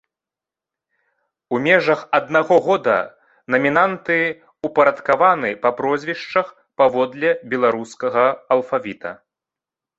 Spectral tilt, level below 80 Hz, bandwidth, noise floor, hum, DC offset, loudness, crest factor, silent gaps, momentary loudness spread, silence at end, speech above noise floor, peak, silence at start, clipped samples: -6 dB/octave; -66 dBFS; 8 kHz; -88 dBFS; none; under 0.1%; -18 LUFS; 18 dB; none; 9 LU; 0.85 s; 70 dB; -2 dBFS; 1.5 s; under 0.1%